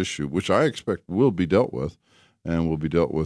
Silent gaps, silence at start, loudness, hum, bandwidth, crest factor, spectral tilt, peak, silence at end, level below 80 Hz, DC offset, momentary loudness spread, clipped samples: none; 0 s; -24 LUFS; none; 11 kHz; 18 dB; -6.5 dB/octave; -6 dBFS; 0 s; -46 dBFS; under 0.1%; 9 LU; under 0.1%